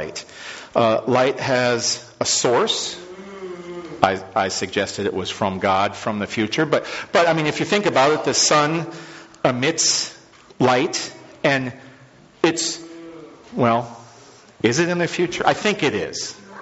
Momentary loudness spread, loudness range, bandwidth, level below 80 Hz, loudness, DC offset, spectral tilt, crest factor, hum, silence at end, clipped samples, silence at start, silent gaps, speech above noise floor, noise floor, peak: 16 LU; 4 LU; 8.2 kHz; -58 dBFS; -20 LUFS; under 0.1%; -3.5 dB/octave; 22 dB; none; 0 s; under 0.1%; 0 s; none; 28 dB; -48 dBFS; 0 dBFS